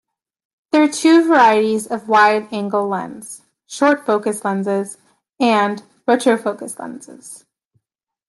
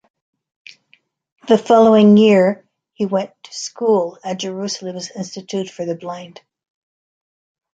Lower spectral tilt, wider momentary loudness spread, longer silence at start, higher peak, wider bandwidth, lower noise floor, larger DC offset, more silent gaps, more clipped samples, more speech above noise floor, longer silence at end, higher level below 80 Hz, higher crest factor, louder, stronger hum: second, -4.5 dB/octave vs -6 dB/octave; about the same, 21 LU vs 19 LU; second, 0.75 s vs 1.45 s; about the same, -2 dBFS vs -2 dBFS; first, 12.5 kHz vs 8 kHz; first, -82 dBFS vs -58 dBFS; neither; neither; neither; first, 66 dB vs 43 dB; second, 0.9 s vs 1.5 s; second, -70 dBFS vs -64 dBFS; about the same, 16 dB vs 16 dB; about the same, -16 LUFS vs -16 LUFS; neither